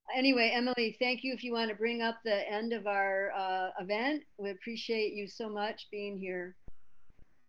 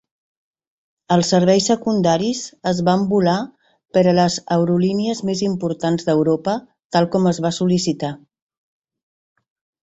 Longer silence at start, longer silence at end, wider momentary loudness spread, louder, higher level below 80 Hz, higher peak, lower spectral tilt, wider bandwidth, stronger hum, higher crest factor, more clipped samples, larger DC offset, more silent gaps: second, 0.05 s vs 1.1 s; second, 0.25 s vs 1.75 s; first, 11 LU vs 8 LU; second, -33 LUFS vs -18 LUFS; second, -68 dBFS vs -56 dBFS; second, -14 dBFS vs -2 dBFS; about the same, -5 dB/octave vs -5.5 dB/octave; first, 9.2 kHz vs 8.2 kHz; neither; about the same, 20 dB vs 16 dB; neither; neither; second, none vs 6.84-6.90 s